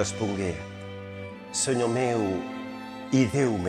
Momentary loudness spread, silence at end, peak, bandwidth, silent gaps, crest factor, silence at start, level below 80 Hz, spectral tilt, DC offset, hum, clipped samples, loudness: 15 LU; 0 s; -10 dBFS; 13 kHz; none; 18 dB; 0 s; -56 dBFS; -5 dB/octave; under 0.1%; none; under 0.1%; -27 LUFS